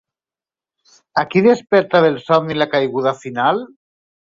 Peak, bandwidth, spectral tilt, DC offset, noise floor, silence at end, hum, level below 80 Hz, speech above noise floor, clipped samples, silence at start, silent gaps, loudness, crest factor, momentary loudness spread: -2 dBFS; 7.6 kHz; -6.5 dB/octave; under 0.1%; under -90 dBFS; 0.6 s; none; -60 dBFS; over 74 dB; under 0.1%; 1.15 s; none; -16 LUFS; 16 dB; 7 LU